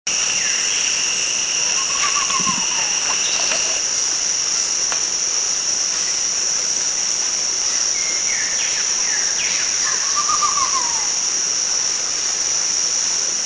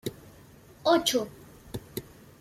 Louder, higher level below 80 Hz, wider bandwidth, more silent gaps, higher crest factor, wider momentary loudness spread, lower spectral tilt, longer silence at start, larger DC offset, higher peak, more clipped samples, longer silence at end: first, -16 LUFS vs -27 LUFS; about the same, -56 dBFS vs -58 dBFS; second, 8 kHz vs 16 kHz; neither; about the same, 16 dB vs 20 dB; second, 1 LU vs 18 LU; second, 2 dB/octave vs -3.5 dB/octave; about the same, 0.05 s vs 0.05 s; first, 0.1% vs under 0.1%; first, -4 dBFS vs -10 dBFS; neither; second, 0 s vs 0.4 s